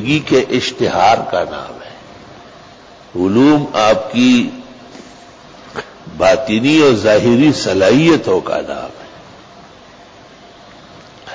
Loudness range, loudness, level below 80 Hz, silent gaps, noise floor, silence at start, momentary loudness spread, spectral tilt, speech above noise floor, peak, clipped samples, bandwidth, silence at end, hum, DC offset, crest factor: 5 LU; -13 LUFS; -46 dBFS; none; -40 dBFS; 0 s; 19 LU; -5.5 dB/octave; 28 dB; -2 dBFS; under 0.1%; 8 kHz; 0 s; none; under 0.1%; 14 dB